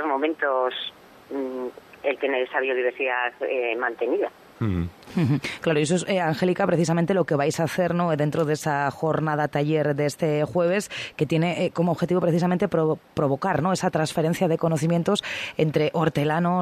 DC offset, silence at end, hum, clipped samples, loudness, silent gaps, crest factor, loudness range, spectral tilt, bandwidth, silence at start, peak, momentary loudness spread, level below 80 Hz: under 0.1%; 0 s; none; under 0.1%; -24 LUFS; none; 16 dB; 3 LU; -6 dB/octave; 13.5 kHz; 0 s; -8 dBFS; 7 LU; -60 dBFS